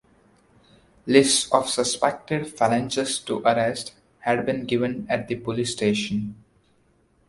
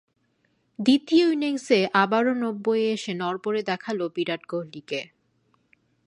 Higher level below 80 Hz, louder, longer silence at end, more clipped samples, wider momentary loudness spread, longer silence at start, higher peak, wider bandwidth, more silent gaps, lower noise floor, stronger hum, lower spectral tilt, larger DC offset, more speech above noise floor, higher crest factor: first, -58 dBFS vs -74 dBFS; about the same, -23 LUFS vs -24 LUFS; about the same, 0.95 s vs 1 s; neither; about the same, 11 LU vs 13 LU; first, 1.05 s vs 0.8 s; first, 0 dBFS vs -6 dBFS; about the same, 11.5 kHz vs 11 kHz; neither; second, -62 dBFS vs -69 dBFS; neither; second, -3.5 dB/octave vs -5 dB/octave; neither; second, 39 dB vs 46 dB; first, 24 dB vs 18 dB